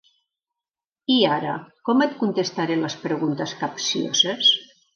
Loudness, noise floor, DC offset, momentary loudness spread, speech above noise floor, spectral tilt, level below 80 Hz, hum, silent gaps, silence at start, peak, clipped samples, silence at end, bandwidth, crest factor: -21 LUFS; -90 dBFS; under 0.1%; 10 LU; 68 dB; -3.5 dB/octave; -74 dBFS; none; none; 1.1 s; -6 dBFS; under 0.1%; 0.3 s; 7.2 kHz; 18 dB